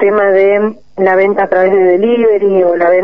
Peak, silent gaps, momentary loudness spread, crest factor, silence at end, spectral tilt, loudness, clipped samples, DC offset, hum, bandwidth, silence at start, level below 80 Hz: 0 dBFS; none; 4 LU; 10 dB; 0 s; -8.5 dB/octave; -10 LUFS; under 0.1%; 1%; none; 5 kHz; 0 s; -52 dBFS